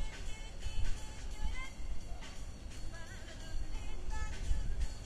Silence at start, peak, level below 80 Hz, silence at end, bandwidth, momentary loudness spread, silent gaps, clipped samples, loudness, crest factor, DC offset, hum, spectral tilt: 0 s; -20 dBFS; -40 dBFS; 0 s; 11 kHz; 8 LU; none; under 0.1%; -45 LUFS; 16 dB; under 0.1%; none; -4 dB/octave